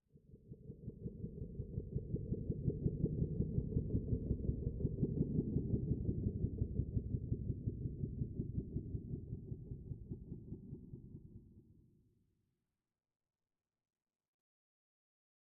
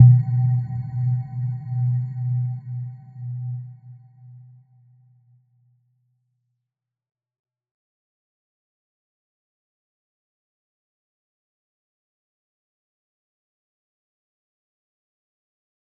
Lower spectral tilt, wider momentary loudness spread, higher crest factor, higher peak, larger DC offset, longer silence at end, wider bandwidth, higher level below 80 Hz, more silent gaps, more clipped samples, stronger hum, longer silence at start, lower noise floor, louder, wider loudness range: first, -16 dB/octave vs -13.5 dB/octave; about the same, 14 LU vs 15 LU; second, 20 dB vs 26 dB; second, -22 dBFS vs -2 dBFS; neither; second, 3.7 s vs 11.6 s; second, 1 kHz vs 2 kHz; first, -50 dBFS vs -64 dBFS; neither; neither; neither; first, 0.15 s vs 0 s; first, under -90 dBFS vs -84 dBFS; second, -42 LUFS vs -24 LUFS; about the same, 15 LU vs 14 LU